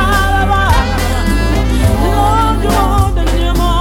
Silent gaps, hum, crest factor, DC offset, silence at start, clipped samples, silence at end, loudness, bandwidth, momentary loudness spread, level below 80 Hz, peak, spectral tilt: none; none; 10 dB; under 0.1%; 0 s; under 0.1%; 0 s; -13 LUFS; 16.5 kHz; 3 LU; -14 dBFS; 0 dBFS; -5.5 dB/octave